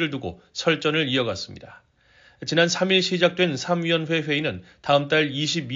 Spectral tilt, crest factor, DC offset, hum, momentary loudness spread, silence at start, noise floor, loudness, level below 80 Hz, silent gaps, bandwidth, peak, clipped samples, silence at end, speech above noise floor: -3 dB/octave; 18 dB; under 0.1%; none; 13 LU; 0 s; -56 dBFS; -22 LUFS; -60 dBFS; none; 7.6 kHz; -4 dBFS; under 0.1%; 0 s; 33 dB